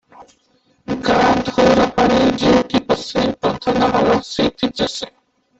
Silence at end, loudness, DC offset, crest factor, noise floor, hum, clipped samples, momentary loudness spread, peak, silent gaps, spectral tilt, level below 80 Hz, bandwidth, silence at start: 0.5 s; -16 LUFS; under 0.1%; 14 dB; -60 dBFS; none; under 0.1%; 8 LU; -2 dBFS; none; -5 dB/octave; -42 dBFS; 8.2 kHz; 0.2 s